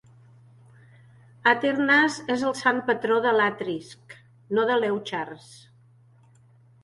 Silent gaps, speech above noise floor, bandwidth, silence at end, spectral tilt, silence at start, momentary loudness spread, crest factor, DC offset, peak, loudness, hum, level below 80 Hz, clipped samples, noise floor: none; 32 dB; 11.5 kHz; 1.25 s; -4.5 dB/octave; 1.45 s; 13 LU; 20 dB; under 0.1%; -6 dBFS; -23 LUFS; none; -72 dBFS; under 0.1%; -56 dBFS